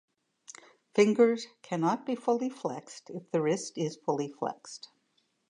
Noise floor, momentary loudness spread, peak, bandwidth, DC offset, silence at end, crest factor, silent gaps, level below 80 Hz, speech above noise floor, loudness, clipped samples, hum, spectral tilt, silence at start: -74 dBFS; 19 LU; -10 dBFS; 10.5 kHz; under 0.1%; 0.75 s; 20 dB; none; -86 dBFS; 45 dB; -30 LUFS; under 0.1%; none; -5.5 dB/octave; 0.5 s